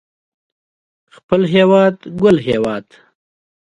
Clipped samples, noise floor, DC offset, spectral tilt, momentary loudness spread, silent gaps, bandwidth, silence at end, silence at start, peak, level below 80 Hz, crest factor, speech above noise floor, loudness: under 0.1%; under -90 dBFS; under 0.1%; -7.5 dB/octave; 9 LU; none; 10.5 kHz; 0.9 s; 1.3 s; 0 dBFS; -50 dBFS; 16 dB; over 76 dB; -14 LUFS